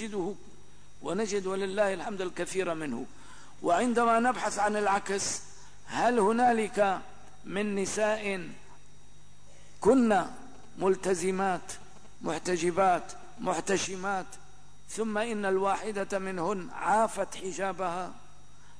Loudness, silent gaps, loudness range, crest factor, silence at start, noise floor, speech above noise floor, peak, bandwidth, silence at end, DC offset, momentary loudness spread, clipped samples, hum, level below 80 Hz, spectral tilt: -30 LUFS; none; 4 LU; 16 dB; 0 s; -57 dBFS; 28 dB; -14 dBFS; 11 kHz; 0.6 s; 0.8%; 14 LU; under 0.1%; 50 Hz at -60 dBFS; -60 dBFS; -4 dB/octave